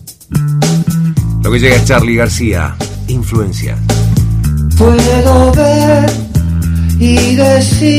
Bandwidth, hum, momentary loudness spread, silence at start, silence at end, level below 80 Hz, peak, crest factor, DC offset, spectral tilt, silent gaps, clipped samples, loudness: 16 kHz; none; 8 LU; 0.05 s; 0 s; -18 dBFS; 0 dBFS; 10 dB; under 0.1%; -6 dB/octave; none; 0.3%; -10 LUFS